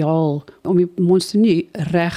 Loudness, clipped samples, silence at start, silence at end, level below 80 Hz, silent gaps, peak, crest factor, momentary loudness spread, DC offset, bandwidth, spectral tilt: -18 LUFS; under 0.1%; 0 s; 0 s; -56 dBFS; none; -6 dBFS; 12 dB; 6 LU; under 0.1%; 13.5 kHz; -7 dB/octave